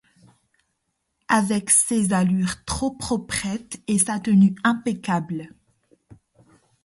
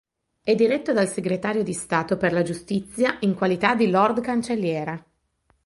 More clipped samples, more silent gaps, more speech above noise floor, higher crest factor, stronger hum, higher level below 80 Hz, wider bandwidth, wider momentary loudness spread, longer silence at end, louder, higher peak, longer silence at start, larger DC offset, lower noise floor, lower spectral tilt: neither; neither; first, 54 dB vs 45 dB; about the same, 20 dB vs 18 dB; neither; first, -50 dBFS vs -58 dBFS; about the same, 11.5 kHz vs 11.5 kHz; about the same, 10 LU vs 9 LU; about the same, 0.7 s vs 0.65 s; about the same, -21 LUFS vs -23 LUFS; about the same, -4 dBFS vs -4 dBFS; first, 1.3 s vs 0.45 s; neither; first, -75 dBFS vs -67 dBFS; about the same, -4.5 dB/octave vs -5.5 dB/octave